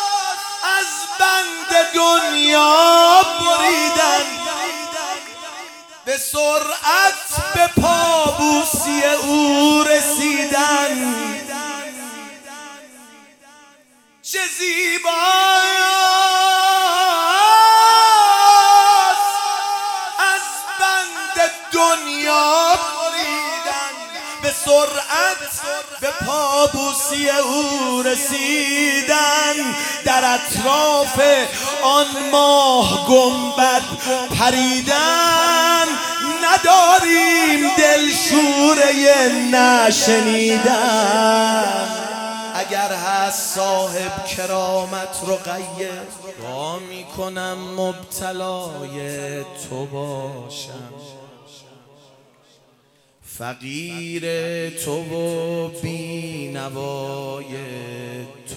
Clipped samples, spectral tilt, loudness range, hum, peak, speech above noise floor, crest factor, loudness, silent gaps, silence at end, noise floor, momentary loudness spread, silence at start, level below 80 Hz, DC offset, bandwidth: under 0.1%; -2 dB/octave; 15 LU; none; 0 dBFS; 40 dB; 18 dB; -15 LUFS; none; 0 s; -57 dBFS; 17 LU; 0 s; -50 dBFS; under 0.1%; 18 kHz